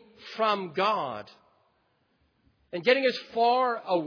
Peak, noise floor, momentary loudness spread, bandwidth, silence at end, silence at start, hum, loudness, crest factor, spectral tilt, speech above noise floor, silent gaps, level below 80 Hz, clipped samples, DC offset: -8 dBFS; -71 dBFS; 15 LU; 5.4 kHz; 0 s; 0.2 s; none; -26 LUFS; 20 dB; -5 dB/octave; 44 dB; none; -76 dBFS; under 0.1%; under 0.1%